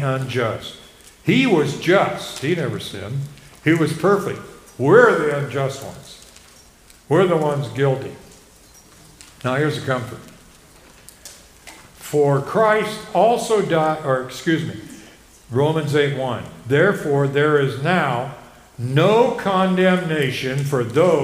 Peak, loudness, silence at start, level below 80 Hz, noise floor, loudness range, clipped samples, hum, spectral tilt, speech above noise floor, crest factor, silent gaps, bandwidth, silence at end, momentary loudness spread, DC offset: 0 dBFS; -19 LUFS; 0 s; -54 dBFS; -48 dBFS; 6 LU; under 0.1%; none; -6 dB/octave; 30 dB; 20 dB; none; 16 kHz; 0 s; 17 LU; under 0.1%